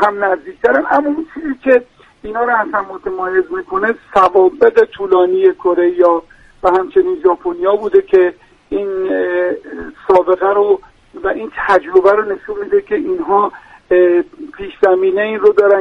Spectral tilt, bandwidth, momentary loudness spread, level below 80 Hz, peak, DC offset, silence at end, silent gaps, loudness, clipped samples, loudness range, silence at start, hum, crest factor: -6.5 dB/octave; 5.8 kHz; 10 LU; -48 dBFS; 0 dBFS; under 0.1%; 0 s; none; -14 LUFS; under 0.1%; 3 LU; 0 s; none; 14 dB